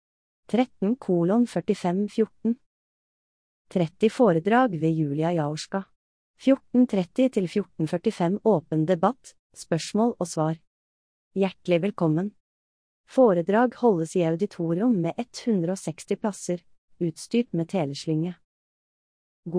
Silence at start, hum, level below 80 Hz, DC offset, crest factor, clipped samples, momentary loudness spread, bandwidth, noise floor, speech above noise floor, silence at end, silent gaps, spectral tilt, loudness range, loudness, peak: 0.5 s; none; -68 dBFS; under 0.1%; 18 dB; under 0.1%; 10 LU; 10.5 kHz; under -90 dBFS; over 66 dB; 0 s; 2.66-3.65 s, 5.96-6.34 s, 9.39-9.50 s, 10.67-11.31 s, 12.40-13.04 s, 16.78-16.88 s, 18.44-19.43 s; -7 dB/octave; 4 LU; -25 LUFS; -8 dBFS